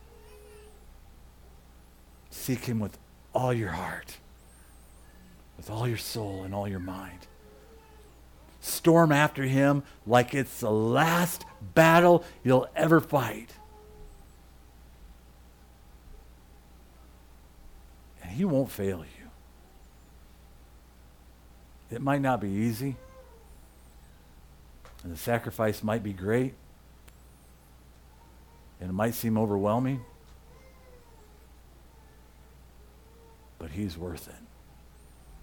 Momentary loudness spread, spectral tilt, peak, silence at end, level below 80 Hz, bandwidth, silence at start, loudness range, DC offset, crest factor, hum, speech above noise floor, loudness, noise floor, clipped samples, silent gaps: 20 LU; -6 dB/octave; -8 dBFS; 0.05 s; -54 dBFS; 19 kHz; 0.25 s; 15 LU; under 0.1%; 24 dB; none; 28 dB; -27 LUFS; -54 dBFS; under 0.1%; none